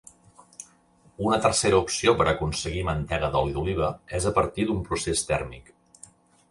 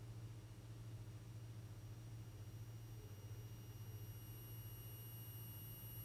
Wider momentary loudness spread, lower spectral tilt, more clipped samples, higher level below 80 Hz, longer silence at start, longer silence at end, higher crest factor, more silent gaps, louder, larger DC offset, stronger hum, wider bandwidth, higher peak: first, 8 LU vs 3 LU; about the same, -4.5 dB/octave vs -5 dB/octave; neither; first, -42 dBFS vs -66 dBFS; first, 0.6 s vs 0 s; first, 0.9 s vs 0 s; first, 20 dB vs 12 dB; neither; first, -25 LUFS vs -55 LUFS; neither; neither; second, 11.5 kHz vs 18 kHz; first, -6 dBFS vs -42 dBFS